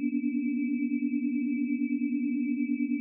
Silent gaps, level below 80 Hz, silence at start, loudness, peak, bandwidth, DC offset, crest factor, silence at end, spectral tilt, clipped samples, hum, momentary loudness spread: none; under -90 dBFS; 0 s; -30 LUFS; -20 dBFS; 2.8 kHz; under 0.1%; 10 dB; 0 s; -8 dB/octave; under 0.1%; none; 0 LU